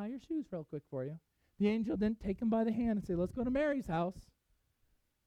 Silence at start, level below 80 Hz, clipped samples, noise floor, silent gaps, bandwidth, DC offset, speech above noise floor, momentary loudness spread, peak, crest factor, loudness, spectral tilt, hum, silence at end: 0 s; -56 dBFS; under 0.1%; -76 dBFS; none; 9.4 kHz; under 0.1%; 41 dB; 10 LU; -20 dBFS; 16 dB; -36 LUFS; -8.5 dB/octave; none; 1.05 s